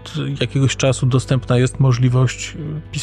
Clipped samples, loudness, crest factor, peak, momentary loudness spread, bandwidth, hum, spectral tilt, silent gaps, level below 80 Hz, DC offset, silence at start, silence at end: under 0.1%; -18 LUFS; 14 dB; -4 dBFS; 11 LU; 10 kHz; none; -6 dB/octave; none; -38 dBFS; under 0.1%; 0 s; 0 s